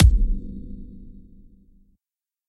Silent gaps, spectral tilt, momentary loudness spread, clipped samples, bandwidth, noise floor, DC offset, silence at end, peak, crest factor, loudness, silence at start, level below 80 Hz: none; -7.5 dB/octave; 24 LU; under 0.1%; 11 kHz; under -90 dBFS; under 0.1%; 1.4 s; -2 dBFS; 22 dB; -25 LUFS; 0 s; -24 dBFS